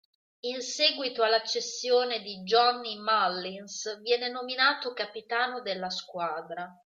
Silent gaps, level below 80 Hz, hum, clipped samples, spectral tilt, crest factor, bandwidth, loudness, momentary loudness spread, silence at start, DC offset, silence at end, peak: none; -82 dBFS; none; under 0.1%; -1.5 dB/octave; 20 dB; 7.8 kHz; -28 LUFS; 11 LU; 0.45 s; under 0.1%; 0.2 s; -10 dBFS